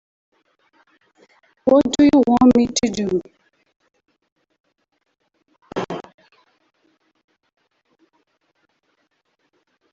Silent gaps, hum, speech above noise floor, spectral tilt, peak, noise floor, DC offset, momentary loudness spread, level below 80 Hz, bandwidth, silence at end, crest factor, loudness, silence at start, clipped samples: 3.76-3.80 s, 4.32-4.36 s, 4.60-4.64 s; none; 54 dB; -5 dB/octave; -2 dBFS; -69 dBFS; under 0.1%; 17 LU; -52 dBFS; 8 kHz; 3.9 s; 20 dB; -17 LUFS; 1.65 s; under 0.1%